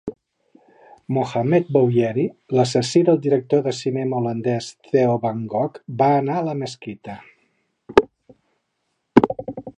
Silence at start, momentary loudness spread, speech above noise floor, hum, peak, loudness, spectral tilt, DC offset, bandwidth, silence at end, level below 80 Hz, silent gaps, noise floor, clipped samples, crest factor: 0.05 s; 13 LU; 53 dB; none; 0 dBFS; -20 LUFS; -6.5 dB/octave; under 0.1%; 10.5 kHz; 0.05 s; -54 dBFS; none; -73 dBFS; under 0.1%; 20 dB